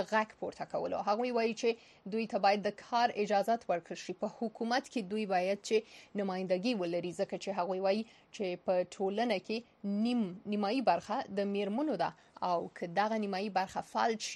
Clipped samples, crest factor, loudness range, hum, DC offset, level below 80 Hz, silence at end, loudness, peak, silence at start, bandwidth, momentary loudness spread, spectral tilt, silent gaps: under 0.1%; 18 dB; 2 LU; none; under 0.1%; -78 dBFS; 0 s; -34 LUFS; -16 dBFS; 0 s; 12 kHz; 8 LU; -5 dB/octave; none